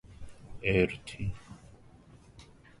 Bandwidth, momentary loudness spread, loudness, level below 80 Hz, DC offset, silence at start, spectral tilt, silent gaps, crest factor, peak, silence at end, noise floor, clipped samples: 11.5 kHz; 26 LU; -31 LUFS; -50 dBFS; under 0.1%; 0.05 s; -6.5 dB/octave; none; 24 dB; -12 dBFS; 0.3 s; -56 dBFS; under 0.1%